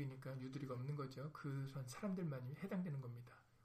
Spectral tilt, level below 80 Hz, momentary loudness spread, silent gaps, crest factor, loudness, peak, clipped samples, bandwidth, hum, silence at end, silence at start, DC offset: -7.5 dB/octave; -78 dBFS; 5 LU; none; 14 dB; -48 LUFS; -34 dBFS; under 0.1%; 15 kHz; none; 0.1 s; 0 s; under 0.1%